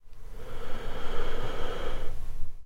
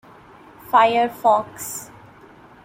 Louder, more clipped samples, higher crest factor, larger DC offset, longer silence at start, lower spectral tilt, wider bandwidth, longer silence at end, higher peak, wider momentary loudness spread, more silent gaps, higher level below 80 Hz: second, -39 LUFS vs -19 LUFS; neither; second, 10 dB vs 18 dB; neither; second, 0.05 s vs 0.7 s; first, -5.5 dB/octave vs -3 dB/octave; second, 4.6 kHz vs 16.5 kHz; second, 0 s vs 0.8 s; second, -12 dBFS vs -4 dBFS; second, 9 LU vs 15 LU; neither; first, -32 dBFS vs -62 dBFS